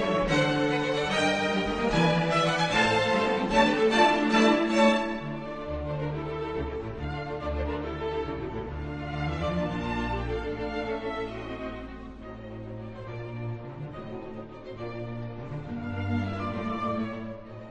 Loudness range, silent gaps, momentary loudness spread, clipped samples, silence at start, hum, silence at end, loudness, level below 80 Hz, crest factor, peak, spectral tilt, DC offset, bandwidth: 15 LU; none; 17 LU; under 0.1%; 0 s; none; 0 s; -28 LUFS; -44 dBFS; 20 dB; -10 dBFS; -5.5 dB/octave; under 0.1%; 10.5 kHz